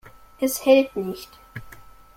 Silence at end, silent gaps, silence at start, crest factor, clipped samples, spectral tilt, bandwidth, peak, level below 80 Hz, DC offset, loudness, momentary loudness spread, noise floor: 0.45 s; none; 0.4 s; 20 dB; under 0.1%; -4 dB/octave; 16.5 kHz; -4 dBFS; -54 dBFS; under 0.1%; -21 LUFS; 23 LU; -45 dBFS